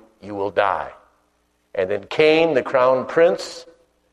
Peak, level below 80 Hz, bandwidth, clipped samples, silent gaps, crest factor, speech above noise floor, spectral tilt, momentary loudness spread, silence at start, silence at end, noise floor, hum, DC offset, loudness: -2 dBFS; -60 dBFS; 10.5 kHz; under 0.1%; none; 18 dB; 47 dB; -5 dB/octave; 17 LU; 0.25 s; 0.5 s; -65 dBFS; 60 Hz at -60 dBFS; under 0.1%; -19 LUFS